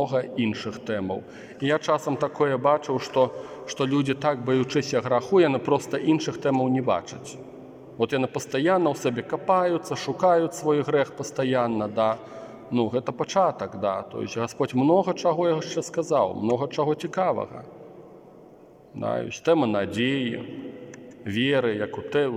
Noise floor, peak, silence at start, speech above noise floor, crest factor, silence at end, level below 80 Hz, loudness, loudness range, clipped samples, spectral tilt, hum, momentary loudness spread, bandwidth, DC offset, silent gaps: -50 dBFS; -6 dBFS; 0 s; 26 dB; 18 dB; 0 s; -68 dBFS; -25 LUFS; 4 LU; under 0.1%; -6 dB/octave; none; 14 LU; 16 kHz; under 0.1%; none